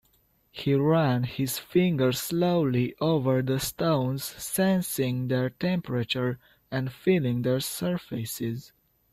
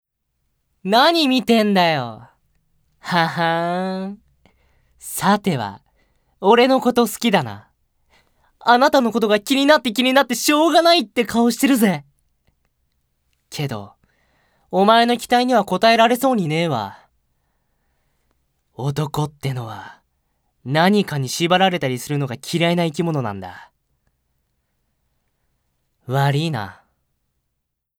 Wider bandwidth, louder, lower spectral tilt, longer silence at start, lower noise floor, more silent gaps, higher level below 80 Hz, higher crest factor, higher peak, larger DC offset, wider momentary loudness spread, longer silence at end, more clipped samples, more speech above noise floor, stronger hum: second, 16 kHz vs over 20 kHz; second, -27 LUFS vs -18 LUFS; about the same, -6 dB/octave vs -5 dB/octave; second, 0.55 s vs 0.85 s; second, -66 dBFS vs -77 dBFS; neither; about the same, -60 dBFS vs -60 dBFS; about the same, 16 dB vs 20 dB; second, -12 dBFS vs 0 dBFS; neither; second, 9 LU vs 15 LU; second, 0.45 s vs 1.3 s; neither; second, 40 dB vs 60 dB; neither